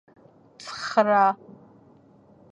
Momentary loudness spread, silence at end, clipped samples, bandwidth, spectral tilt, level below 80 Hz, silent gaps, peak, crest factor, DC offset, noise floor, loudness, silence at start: 19 LU; 1.15 s; under 0.1%; 10.5 kHz; -4.5 dB/octave; -74 dBFS; none; -4 dBFS; 22 dB; under 0.1%; -55 dBFS; -22 LUFS; 0.6 s